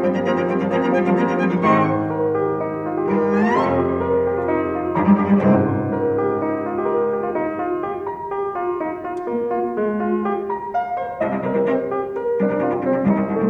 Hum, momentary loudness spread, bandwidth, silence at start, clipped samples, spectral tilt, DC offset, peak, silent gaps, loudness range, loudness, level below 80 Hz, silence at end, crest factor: none; 7 LU; 6.8 kHz; 0 s; under 0.1%; -9 dB/octave; under 0.1%; -4 dBFS; none; 5 LU; -20 LUFS; -52 dBFS; 0 s; 16 dB